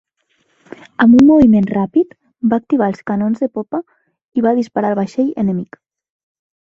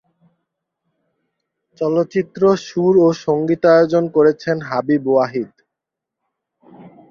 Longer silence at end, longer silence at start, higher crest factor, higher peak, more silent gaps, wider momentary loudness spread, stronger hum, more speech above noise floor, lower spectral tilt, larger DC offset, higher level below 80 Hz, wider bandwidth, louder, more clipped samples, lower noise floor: first, 1.1 s vs 0.25 s; second, 1 s vs 1.8 s; about the same, 14 dB vs 16 dB; about the same, 0 dBFS vs -2 dBFS; first, 4.25-4.32 s vs none; first, 15 LU vs 9 LU; neither; second, 49 dB vs 67 dB; first, -8.5 dB/octave vs -7 dB/octave; neither; first, -48 dBFS vs -60 dBFS; about the same, 7.2 kHz vs 7.2 kHz; about the same, -15 LUFS vs -16 LUFS; neither; second, -63 dBFS vs -83 dBFS